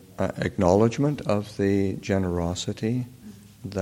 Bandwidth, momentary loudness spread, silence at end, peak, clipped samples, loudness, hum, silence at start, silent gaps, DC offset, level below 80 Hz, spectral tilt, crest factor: 16 kHz; 10 LU; 0 s; -4 dBFS; under 0.1%; -25 LUFS; none; 0.1 s; none; under 0.1%; -50 dBFS; -6.5 dB/octave; 20 dB